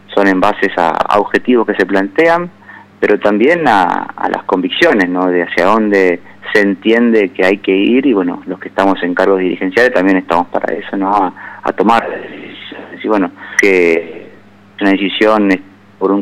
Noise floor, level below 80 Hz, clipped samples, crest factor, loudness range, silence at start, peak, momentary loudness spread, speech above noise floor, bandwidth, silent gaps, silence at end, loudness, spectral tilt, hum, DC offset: -41 dBFS; -52 dBFS; under 0.1%; 12 dB; 3 LU; 0.1 s; 0 dBFS; 10 LU; 29 dB; 12.5 kHz; none; 0 s; -12 LUFS; -5.5 dB/octave; none; under 0.1%